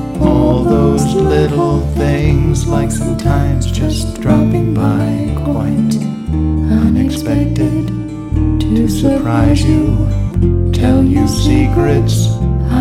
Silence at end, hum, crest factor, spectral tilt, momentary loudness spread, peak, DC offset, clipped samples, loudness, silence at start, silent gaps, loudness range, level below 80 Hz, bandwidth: 0 s; none; 12 dB; -7 dB/octave; 5 LU; 0 dBFS; under 0.1%; under 0.1%; -13 LUFS; 0 s; none; 2 LU; -20 dBFS; 15.5 kHz